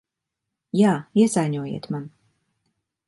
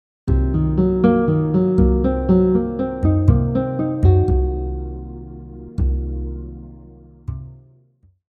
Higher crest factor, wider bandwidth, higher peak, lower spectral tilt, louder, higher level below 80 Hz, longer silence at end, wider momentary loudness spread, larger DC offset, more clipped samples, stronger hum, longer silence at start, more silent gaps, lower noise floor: about the same, 18 dB vs 18 dB; first, 11.5 kHz vs 4.3 kHz; second, -6 dBFS vs 0 dBFS; second, -6.5 dB/octave vs -11.5 dB/octave; second, -22 LUFS vs -18 LUFS; second, -68 dBFS vs -24 dBFS; first, 1 s vs 0.7 s; second, 13 LU vs 19 LU; neither; neither; neither; first, 0.75 s vs 0.25 s; neither; first, -83 dBFS vs -56 dBFS